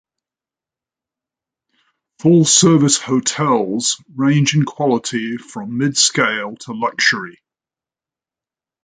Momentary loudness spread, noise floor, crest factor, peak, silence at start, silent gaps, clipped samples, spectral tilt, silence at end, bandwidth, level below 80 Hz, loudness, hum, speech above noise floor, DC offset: 13 LU; -90 dBFS; 18 dB; 0 dBFS; 2.25 s; none; under 0.1%; -3.5 dB/octave; 1.55 s; 9.6 kHz; -62 dBFS; -15 LUFS; none; 74 dB; under 0.1%